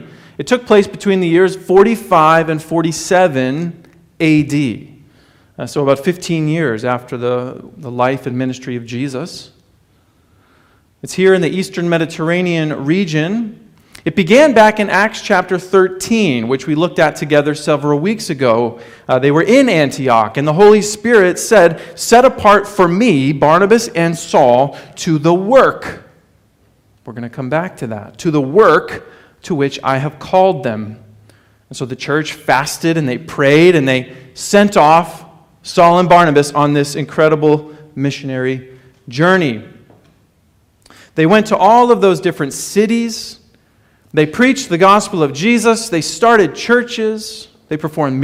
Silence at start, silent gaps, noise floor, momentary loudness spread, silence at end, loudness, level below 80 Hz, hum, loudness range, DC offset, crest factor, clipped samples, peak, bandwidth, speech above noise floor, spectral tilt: 0 s; none; -54 dBFS; 15 LU; 0 s; -13 LUFS; -50 dBFS; none; 7 LU; under 0.1%; 14 dB; under 0.1%; 0 dBFS; 16 kHz; 42 dB; -5.5 dB/octave